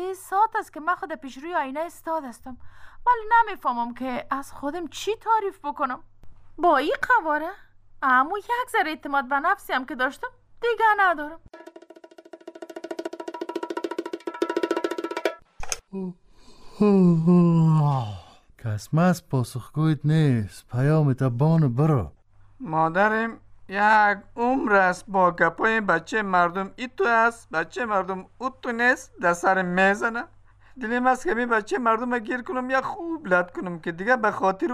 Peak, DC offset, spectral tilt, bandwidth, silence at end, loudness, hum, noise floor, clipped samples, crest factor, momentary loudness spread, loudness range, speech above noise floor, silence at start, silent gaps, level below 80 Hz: -6 dBFS; under 0.1%; -6.5 dB/octave; 15 kHz; 0 s; -23 LUFS; none; -49 dBFS; under 0.1%; 18 dB; 14 LU; 7 LU; 26 dB; 0 s; none; -52 dBFS